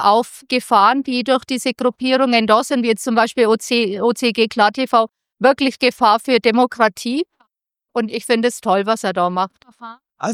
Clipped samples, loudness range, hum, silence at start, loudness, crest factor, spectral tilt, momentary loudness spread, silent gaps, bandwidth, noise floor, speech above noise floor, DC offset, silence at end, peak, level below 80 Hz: under 0.1%; 3 LU; none; 0 s; -17 LUFS; 16 dB; -4 dB/octave; 9 LU; none; 16 kHz; -75 dBFS; 58 dB; under 0.1%; 0 s; 0 dBFS; -64 dBFS